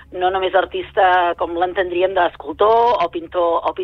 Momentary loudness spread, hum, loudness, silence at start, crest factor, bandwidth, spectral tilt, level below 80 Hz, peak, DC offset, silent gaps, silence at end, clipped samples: 6 LU; none; -17 LUFS; 0.1 s; 14 dB; 6.4 kHz; -6 dB/octave; -48 dBFS; -4 dBFS; under 0.1%; none; 0 s; under 0.1%